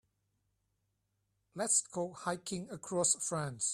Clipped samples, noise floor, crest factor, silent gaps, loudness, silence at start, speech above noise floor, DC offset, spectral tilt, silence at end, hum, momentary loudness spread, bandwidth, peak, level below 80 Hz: under 0.1%; -82 dBFS; 22 dB; none; -34 LUFS; 1.55 s; 46 dB; under 0.1%; -3 dB/octave; 0 s; none; 11 LU; 15 kHz; -16 dBFS; -74 dBFS